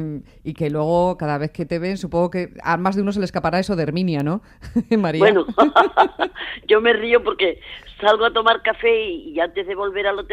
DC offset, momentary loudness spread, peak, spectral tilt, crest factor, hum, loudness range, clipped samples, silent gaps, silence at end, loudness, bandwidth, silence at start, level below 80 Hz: under 0.1%; 10 LU; 0 dBFS; -6.5 dB/octave; 18 dB; none; 5 LU; under 0.1%; none; 0 s; -19 LUFS; 11.5 kHz; 0 s; -46 dBFS